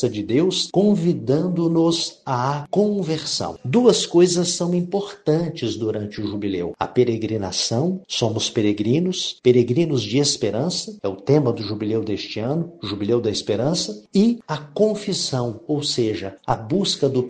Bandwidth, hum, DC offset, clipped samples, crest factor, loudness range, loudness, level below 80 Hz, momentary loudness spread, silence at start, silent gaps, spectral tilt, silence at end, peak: 9.6 kHz; none; under 0.1%; under 0.1%; 18 dB; 3 LU; -21 LUFS; -56 dBFS; 8 LU; 0 s; none; -5 dB/octave; 0 s; -2 dBFS